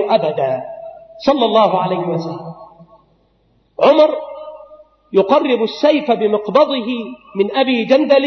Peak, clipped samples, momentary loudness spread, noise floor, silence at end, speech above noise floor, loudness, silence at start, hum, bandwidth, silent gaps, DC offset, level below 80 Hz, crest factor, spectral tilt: 0 dBFS; under 0.1%; 18 LU; -58 dBFS; 0 s; 44 dB; -15 LUFS; 0 s; none; 6.4 kHz; none; under 0.1%; -62 dBFS; 14 dB; -6.5 dB/octave